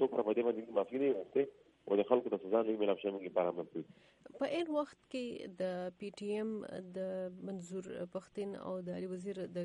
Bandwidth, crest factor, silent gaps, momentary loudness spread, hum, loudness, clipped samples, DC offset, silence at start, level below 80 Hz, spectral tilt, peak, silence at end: 11 kHz; 22 dB; none; 11 LU; none; -38 LUFS; under 0.1%; under 0.1%; 0 s; -80 dBFS; -6.5 dB/octave; -16 dBFS; 0 s